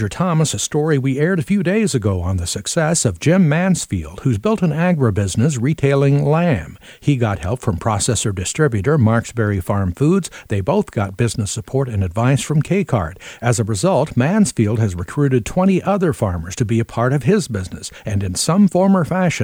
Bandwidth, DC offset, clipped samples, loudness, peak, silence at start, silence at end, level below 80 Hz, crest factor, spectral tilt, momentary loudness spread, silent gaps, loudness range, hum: 16.5 kHz; under 0.1%; under 0.1%; -17 LUFS; -2 dBFS; 0 s; 0 s; -40 dBFS; 16 dB; -6 dB/octave; 7 LU; none; 2 LU; none